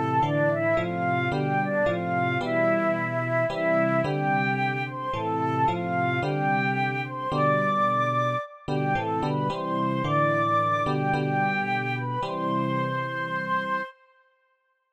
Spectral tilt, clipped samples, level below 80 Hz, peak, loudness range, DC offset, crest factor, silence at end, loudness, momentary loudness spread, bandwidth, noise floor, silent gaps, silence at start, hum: -7.5 dB/octave; under 0.1%; -56 dBFS; -10 dBFS; 2 LU; under 0.1%; 14 dB; 1 s; -25 LUFS; 6 LU; 9.2 kHz; -71 dBFS; none; 0 s; none